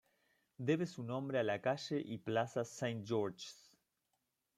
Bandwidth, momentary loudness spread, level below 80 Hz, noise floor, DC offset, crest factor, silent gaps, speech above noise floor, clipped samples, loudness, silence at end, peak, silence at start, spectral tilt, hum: 14.5 kHz; 6 LU; -82 dBFS; -85 dBFS; under 0.1%; 18 dB; none; 47 dB; under 0.1%; -39 LUFS; 1.05 s; -22 dBFS; 0.6 s; -6 dB/octave; none